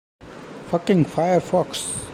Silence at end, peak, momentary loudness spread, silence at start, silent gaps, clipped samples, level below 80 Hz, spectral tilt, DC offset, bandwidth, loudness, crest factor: 0 s; -6 dBFS; 19 LU; 0.2 s; none; under 0.1%; -52 dBFS; -5.5 dB/octave; under 0.1%; 15 kHz; -21 LUFS; 16 dB